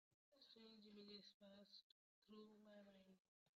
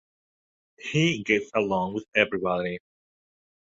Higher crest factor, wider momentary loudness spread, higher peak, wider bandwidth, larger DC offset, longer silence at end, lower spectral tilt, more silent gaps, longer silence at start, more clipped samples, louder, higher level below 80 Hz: second, 18 dB vs 24 dB; second, 6 LU vs 9 LU; second, -50 dBFS vs -4 dBFS; about the same, 7.2 kHz vs 7.8 kHz; neither; second, 0.05 s vs 1 s; second, -3.5 dB/octave vs -5.5 dB/octave; first, 0.14-0.32 s, 1.34-1.40 s, 1.83-2.22 s, 3.20-3.46 s vs none; second, 0.1 s vs 0.8 s; neither; second, -66 LUFS vs -25 LUFS; second, under -90 dBFS vs -62 dBFS